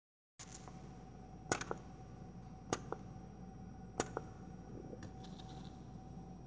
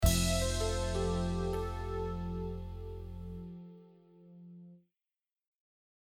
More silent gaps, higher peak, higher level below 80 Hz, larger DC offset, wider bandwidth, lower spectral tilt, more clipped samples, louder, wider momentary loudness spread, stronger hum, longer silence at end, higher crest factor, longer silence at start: neither; about the same, -16 dBFS vs -14 dBFS; second, -60 dBFS vs -42 dBFS; neither; second, 8 kHz vs over 20 kHz; about the same, -4.5 dB/octave vs -4.5 dB/octave; neither; second, -48 LUFS vs -36 LUFS; second, 12 LU vs 22 LU; neither; second, 0 s vs 1.25 s; first, 32 dB vs 22 dB; first, 0.4 s vs 0 s